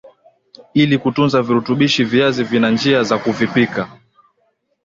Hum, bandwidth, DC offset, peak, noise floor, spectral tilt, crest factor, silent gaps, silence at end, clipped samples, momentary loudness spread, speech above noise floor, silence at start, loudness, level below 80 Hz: none; 7.6 kHz; under 0.1%; -2 dBFS; -64 dBFS; -6 dB/octave; 16 dB; none; 0.95 s; under 0.1%; 5 LU; 49 dB; 0.05 s; -16 LUFS; -54 dBFS